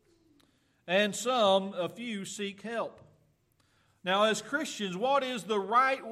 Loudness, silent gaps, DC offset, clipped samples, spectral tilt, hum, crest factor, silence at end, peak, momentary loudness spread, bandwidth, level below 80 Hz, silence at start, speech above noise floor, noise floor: -30 LUFS; none; under 0.1%; under 0.1%; -3.5 dB/octave; none; 18 dB; 0 s; -14 dBFS; 12 LU; 14.5 kHz; -80 dBFS; 0.85 s; 40 dB; -70 dBFS